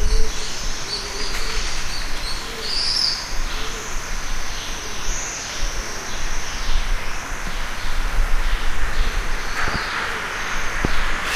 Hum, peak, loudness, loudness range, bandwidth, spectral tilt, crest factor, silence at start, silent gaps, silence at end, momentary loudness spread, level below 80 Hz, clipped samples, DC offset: none; -4 dBFS; -25 LUFS; 4 LU; 14.5 kHz; -2 dB/octave; 16 dB; 0 s; none; 0 s; 6 LU; -24 dBFS; under 0.1%; under 0.1%